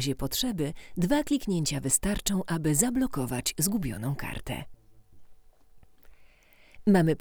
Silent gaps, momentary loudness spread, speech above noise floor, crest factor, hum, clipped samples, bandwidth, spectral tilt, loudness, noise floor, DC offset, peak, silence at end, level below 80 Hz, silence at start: none; 10 LU; 29 dB; 22 dB; none; under 0.1%; over 20 kHz; -4.5 dB/octave; -28 LUFS; -57 dBFS; under 0.1%; -8 dBFS; 0 s; -46 dBFS; 0 s